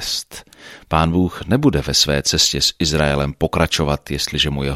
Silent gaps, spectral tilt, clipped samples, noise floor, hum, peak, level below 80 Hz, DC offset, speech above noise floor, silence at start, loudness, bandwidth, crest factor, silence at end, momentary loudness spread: none; -4 dB/octave; under 0.1%; -42 dBFS; none; -2 dBFS; -32 dBFS; under 0.1%; 24 dB; 0 s; -17 LUFS; 15.5 kHz; 16 dB; 0 s; 7 LU